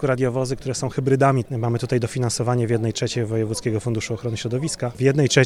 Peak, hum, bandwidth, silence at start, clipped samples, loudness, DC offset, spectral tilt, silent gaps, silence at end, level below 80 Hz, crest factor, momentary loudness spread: -2 dBFS; none; 13 kHz; 0 s; under 0.1%; -22 LUFS; under 0.1%; -5.5 dB/octave; none; 0 s; -48 dBFS; 20 dB; 7 LU